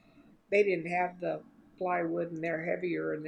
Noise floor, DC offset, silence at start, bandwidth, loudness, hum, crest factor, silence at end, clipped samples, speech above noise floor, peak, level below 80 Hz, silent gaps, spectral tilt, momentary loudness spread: -60 dBFS; under 0.1%; 0.15 s; 9.4 kHz; -32 LUFS; none; 18 dB; 0 s; under 0.1%; 29 dB; -14 dBFS; -74 dBFS; none; -7.5 dB/octave; 9 LU